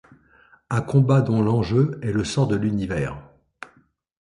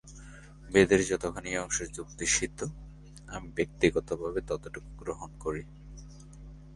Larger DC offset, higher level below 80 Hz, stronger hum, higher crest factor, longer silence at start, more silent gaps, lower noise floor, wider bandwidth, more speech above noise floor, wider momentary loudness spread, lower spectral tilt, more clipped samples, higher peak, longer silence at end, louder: neither; about the same, -46 dBFS vs -48 dBFS; neither; second, 18 dB vs 26 dB; first, 0.7 s vs 0.05 s; neither; first, -60 dBFS vs -48 dBFS; about the same, 11 kHz vs 11.5 kHz; first, 39 dB vs 18 dB; about the same, 24 LU vs 25 LU; first, -7.5 dB/octave vs -4 dB/octave; neither; about the same, -6 dBFS vs -6 dBFS; first, 1 s vs 0 s; first, -22 LUFS vs -30 LUFS